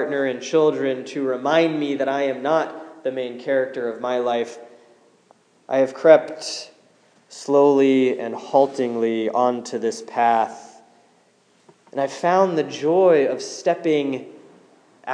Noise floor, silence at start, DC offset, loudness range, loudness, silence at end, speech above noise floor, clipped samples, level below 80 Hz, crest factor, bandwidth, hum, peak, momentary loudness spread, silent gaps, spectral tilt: -59 dBFS; 0 s; under 0.1%; 5 LU; -20 LUFS; 0 s; 39 dB; under 0.1%; -88 dBFS; 20 dB; 10.5 kHz; none; 0 dBFS; 13 LU; none; -5 dB/octave